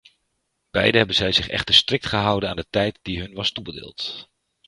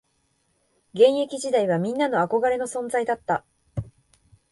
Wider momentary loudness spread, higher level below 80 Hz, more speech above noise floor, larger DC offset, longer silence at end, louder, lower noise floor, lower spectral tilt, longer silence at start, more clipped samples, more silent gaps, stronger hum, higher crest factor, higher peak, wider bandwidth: about the same, 15 LU vs 17 LU; first, -46 dBFS vs -56 dBFS; first, 52 dB vs 47 dB; neither; second, 0.45 s vs 0.6 s; first, -20 LUFS vs -23 LUFS; first, -74 dBFS vs -69 dBFS; about the same, -4 dB/octave vs -5 dB/octave; second, 0.75 s vs 0.95 s; neither; neither; neither; about the same, 24 dB vs 20 dB; first, 0 dBFS vs -6 dBFS; about the same, 11.5 kHz vs 11.5 kHz